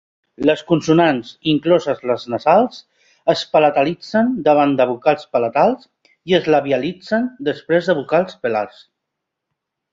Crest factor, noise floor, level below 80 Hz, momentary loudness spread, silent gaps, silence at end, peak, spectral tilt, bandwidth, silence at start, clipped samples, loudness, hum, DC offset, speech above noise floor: 16 dB; -79 dBFS; -60 dBFS; 7 LU; none; 1.25 s; -2 dBFS; -6.5 dB/octave; 7.8 kHz; 0.4 s; under 0.1%; -17 LUFS; none; under 0.1%; 63 dB